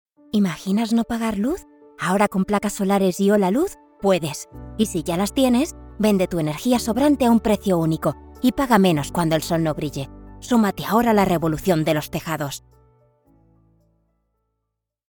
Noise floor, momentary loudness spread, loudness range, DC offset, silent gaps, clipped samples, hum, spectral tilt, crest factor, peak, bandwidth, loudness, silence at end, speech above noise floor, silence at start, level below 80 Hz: -80 dBFS; 10 LU; 3 LU; under 0.1%; none; under 0.1%; none; -6 dB/octave; 20 dB; -2 dBFS; 19 kHz; -21 LUFS; 2.5 s; 60 dB; 0.35 s; -44 dBFS